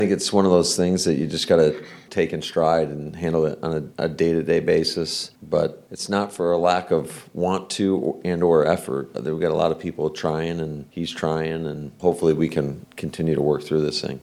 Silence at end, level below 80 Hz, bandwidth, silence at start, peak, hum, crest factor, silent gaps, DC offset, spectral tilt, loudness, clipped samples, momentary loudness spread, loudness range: 0.05 s; -52 dBFS; 14 kHz; 0 s; -2 dBFS; none; 20 dB; none; under 0.1%; -5 dB/octave; -22 LUFS; under 0.1%; 10 LU; 3 LU